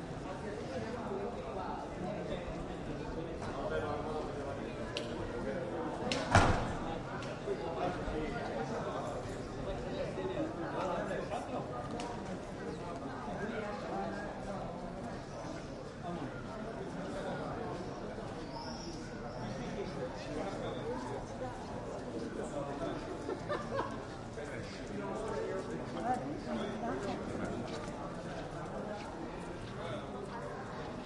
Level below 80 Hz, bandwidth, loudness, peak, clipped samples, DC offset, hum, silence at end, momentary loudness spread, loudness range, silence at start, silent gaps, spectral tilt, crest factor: -52 dBFS; 11.5 kHz; -40 LUFS; -12 dBFS; under 0.1%; under 0.1%; none; 0 s; 6 LU; 7 LU; 0 s; none; -6 dB/octave; 28 dB